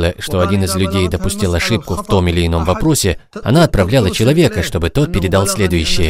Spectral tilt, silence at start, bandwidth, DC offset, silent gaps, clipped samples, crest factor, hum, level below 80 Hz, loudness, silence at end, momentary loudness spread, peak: -5 dB/octave; 0 s; 16.5 kHz; under 0.1%; none; under 0.1%; 14 dB; none; -26 dBFS; -14 LUFS; 0 s; 5 LU; 0 dBFS